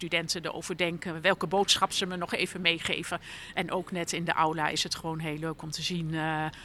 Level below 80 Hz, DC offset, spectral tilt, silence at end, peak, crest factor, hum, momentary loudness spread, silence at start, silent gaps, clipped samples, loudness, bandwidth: -60 dBFS; under 0.1%; -3 dB/octave; 0 s; -8 dBFS; 24 dB; none; 9 LU; 0 s; none; under 0.1%; -29 LUFS; 14.5 kHz